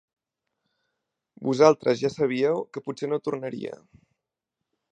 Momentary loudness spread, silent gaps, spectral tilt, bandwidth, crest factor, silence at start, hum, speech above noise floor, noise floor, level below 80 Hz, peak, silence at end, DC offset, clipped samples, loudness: 15 LU; none; -6 dB/octave; 9 kHz; 24 dB; 1.4 s; none; 61 dB; -85 dBFS; -70 dBFS; -2 dBFS; 1.15 s; under 0.1%; under 0.1%; -25 LUFS